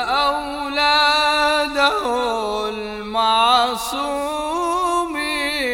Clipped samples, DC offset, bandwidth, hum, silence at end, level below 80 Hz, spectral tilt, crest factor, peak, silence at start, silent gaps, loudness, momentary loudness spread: under 0.1%; under 0.1%; 16.5 kHz; none; 0 s; -46 dBFS; -1.5 dB/octave; 16 dB; -2 dBFS; 0 s; none; -18 LUFS; 9 LU